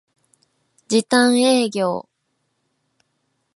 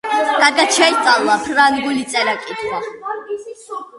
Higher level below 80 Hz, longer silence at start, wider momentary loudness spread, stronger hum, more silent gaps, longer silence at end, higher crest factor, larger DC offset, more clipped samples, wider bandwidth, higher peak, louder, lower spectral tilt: second, -70 dBFS vs -58 dBFS; first, 0.9 s vs 0.05 s; second, 9 LU vs 16 LU; neither; neither; first, 1.55 s vs 0 s; about the same, 20 dB vs 16 dB; neither; neither; about the same, 11.5 kHz vs 11.5 kHz; about the same, -2 dBFS vs 0 dBFS; second, -18 LUFS vs -15 LUFS; first, -3.5 dB/octave vs -1 dB/octave